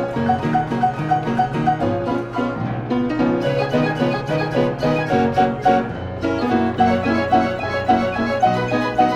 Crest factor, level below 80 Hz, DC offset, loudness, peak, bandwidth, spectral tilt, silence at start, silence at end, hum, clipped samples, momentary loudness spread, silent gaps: 16 dB; -44 dBFS; under 0.1%; -19 LUFS; -2 dBFS; 11 kHz; -7.5 dB/octave; 0 s; 0 s; none; under 0.1%; 5 LU; none